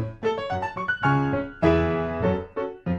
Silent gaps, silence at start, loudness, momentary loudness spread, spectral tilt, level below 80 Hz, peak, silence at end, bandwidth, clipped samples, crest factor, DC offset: none; 0 s; -25 LUFS; 7 LU; -8 dB/octave; -42 dBFS; -6 dBFS; 0 s; 7.6 kHz; under 0.1%; 18 dB; under 0.1%